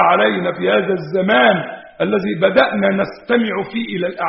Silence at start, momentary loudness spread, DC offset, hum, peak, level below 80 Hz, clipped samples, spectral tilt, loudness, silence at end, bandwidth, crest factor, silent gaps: 0 s; 9 LU; under 0.1%; none; 0 dBFS; -56 dBFS; under 0.1%; -3.5 dB/octave; -16 LUFS; 0 s; 5.8 kHz; 16 dB; none